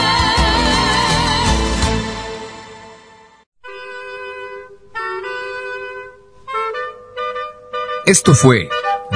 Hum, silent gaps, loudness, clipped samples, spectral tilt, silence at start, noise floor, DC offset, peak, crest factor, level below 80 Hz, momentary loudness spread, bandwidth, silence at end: none; 3.46-3.52 s; -16 LUFS; under 0.1%; -4 dB/octave; 0 s; -45 dBFS; under 0.1%; 0 dBFS; 18 dB; -30 dBFS; 20 LU; 11 kHz; 0 s